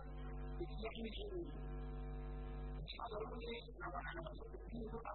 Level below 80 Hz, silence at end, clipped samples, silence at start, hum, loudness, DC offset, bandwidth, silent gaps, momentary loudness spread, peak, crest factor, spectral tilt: -50 dBFS; 0 s; under 0.1%; 0 s; none; -49 LUFS; under 0.1%; 4.2 kHz; none; 3 LU; -32 dBFS; 14 dB; -5 dB/octave